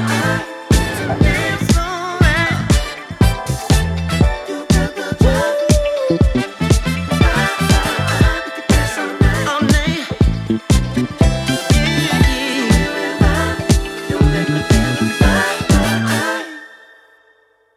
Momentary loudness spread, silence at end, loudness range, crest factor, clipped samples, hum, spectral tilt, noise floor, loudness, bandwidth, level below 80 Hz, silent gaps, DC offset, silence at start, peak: 5 LU; 1 s; 1 LU; 14 dB; under 0.1%; none; -5 dB/octave; -55 dBFS; -16 LUFS; 15.5 kHz; -22 dBFS; none; under 0.1%; 0 s; -2 dBFS